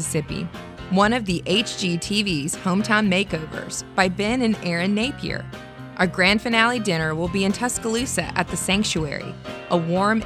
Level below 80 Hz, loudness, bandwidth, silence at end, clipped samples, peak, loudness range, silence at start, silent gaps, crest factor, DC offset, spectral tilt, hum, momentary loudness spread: -44 dBFS; -22 LUFS; 14 kHz; 0 s; under 0.1%; -2 dBFS; 2 LU; 0 s; none; 20 dB; under 0.1%; -4 dB/octave; none; 12 LU